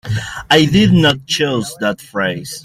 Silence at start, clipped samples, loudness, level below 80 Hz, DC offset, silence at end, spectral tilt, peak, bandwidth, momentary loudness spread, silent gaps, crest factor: 0.05 s; under 0.1%; -14 LUFS; -42 dBFS; under 0.1%; 0.05 s; -5 dB/octave; 0 dBFS; 15.5 kHz; 10 LU; none; 14 dB